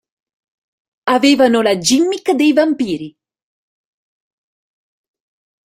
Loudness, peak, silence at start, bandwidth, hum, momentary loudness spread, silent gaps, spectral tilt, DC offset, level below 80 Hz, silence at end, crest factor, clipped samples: -14 LUFS; 0 dBFS; 1.05 s; 16 kHz; none; 13 LU; none; -3.5 dB/octave; under 0.1%; -60 dBFS; 2.55 s; 16 dB; under 0.1%